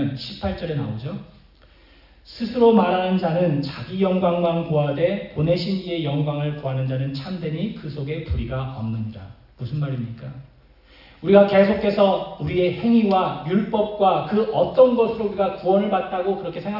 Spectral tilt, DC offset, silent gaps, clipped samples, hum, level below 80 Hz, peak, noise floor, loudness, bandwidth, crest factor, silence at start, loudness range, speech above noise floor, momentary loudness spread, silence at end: -9.5 dB/octave; under 0.1%; none; under 0.1%; none; -46 dBFS; -2 dBFS; -51 dBFS; -21 LUFS; 5.8 kHz; 20 dB; 0 s; 9 LU; 31 dB; 13 LU; 0 s